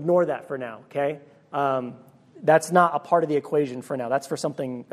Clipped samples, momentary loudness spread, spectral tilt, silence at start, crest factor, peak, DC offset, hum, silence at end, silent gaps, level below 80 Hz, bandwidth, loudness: under 0.1%; 13 LU; -6 dB/octave; 0 s; 22 dB; -2 dBFS; under 0.1%; none; 0.1 s; none; -76 dBFS; 14.5 kHz; -24 LUFS